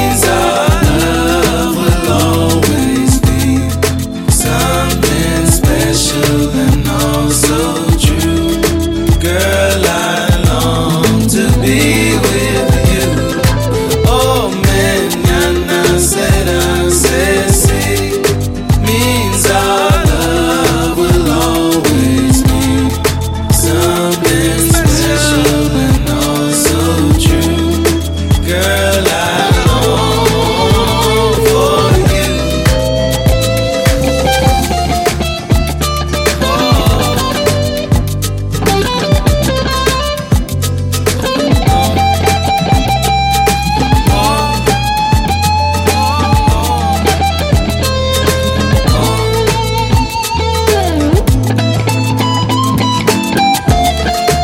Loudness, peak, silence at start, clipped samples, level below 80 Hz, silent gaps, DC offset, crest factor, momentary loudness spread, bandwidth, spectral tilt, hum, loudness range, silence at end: -11 LUFS; 0 dBFS; 0 s; under 0.1%; -20 dBFS; none; under 0.1%; 10 dB; 3 LU; 17 kHz; -4.5 dB/octave; none; 2 LU; 0 s